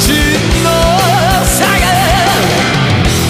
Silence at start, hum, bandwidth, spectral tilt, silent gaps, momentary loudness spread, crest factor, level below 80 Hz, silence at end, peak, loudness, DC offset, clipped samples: 0 s; none; 15.5 kHz; -4 dB/octave; none; 1 LU; 10 dB; -20 dBFS; 0 s; 0 dBFS; -10 LUFS; under 0.1%; under 0.1%